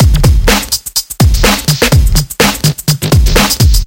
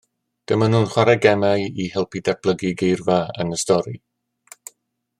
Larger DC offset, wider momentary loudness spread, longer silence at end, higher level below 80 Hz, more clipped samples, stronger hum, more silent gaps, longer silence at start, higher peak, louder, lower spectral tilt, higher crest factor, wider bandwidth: neither; second, 5 LU vs 17 LU; second, 0 s vs 1.2 s; first, -12 dBFS vs -58 dBFS; first, 0.3% vs under 0.1%; neither; neither; second, 0 s vs 0.5 s; about the same, 0 dBFS vs -2 dBFS; first, -10 LUFS vs -20 LUFS; second, -4 dB/octave vs -5.5 dB/octave; second, 8 dB vs 18 dB; first, 17.5 kHz vs 15 kHz